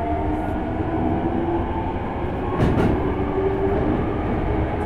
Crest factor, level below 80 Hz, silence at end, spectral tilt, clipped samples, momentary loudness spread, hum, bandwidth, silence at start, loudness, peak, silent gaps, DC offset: 16 dB; -30 dBFS; 0 s; -9 dB/octave; under 0.1%; 5 LU; none; 10 kHz; 0 s; -23 LUFS; -6 dBFS; none; under 0.1%